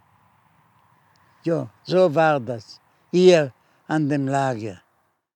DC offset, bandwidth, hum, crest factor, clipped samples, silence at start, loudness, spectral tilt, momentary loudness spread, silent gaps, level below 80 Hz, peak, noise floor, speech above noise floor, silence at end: under 0.1%; 9.4 kHz; none; 20 dB; under 0.1%; 1.45 s; -21 LUFS; -6.5 dB/octave; 16 LU; none; -82 dBFS; -2 dBFS; -67 dBFS; 48 dB; 0.6 s